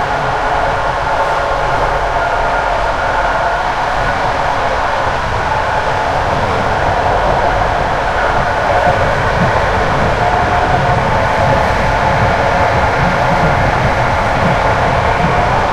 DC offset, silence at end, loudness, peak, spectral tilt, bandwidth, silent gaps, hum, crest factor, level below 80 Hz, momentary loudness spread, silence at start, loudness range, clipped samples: under 0.1%; 0 s; -13 LUFS; 0 dBFS; -5.5 dB/octave; 14 kHz; none; none; 12 dB; -24 dBFS; 3 LU; 0 s; 2 LU; under 0.1%